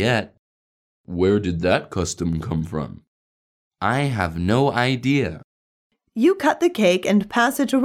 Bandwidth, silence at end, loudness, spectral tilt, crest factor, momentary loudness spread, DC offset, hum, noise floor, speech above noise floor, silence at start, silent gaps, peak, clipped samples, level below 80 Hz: 15.5 kHz; 0 s; -21 LUFS; -5.5 dB/octave; 18 dB; 11 LU; under 0.1%; none; under -90 dBFS; over 70 dB; 0 s; 0.39-1.04 s, 3.08-3.71 s, 5.44-5.90 s; -4 dBFS; under 0.1%; -46 dBFS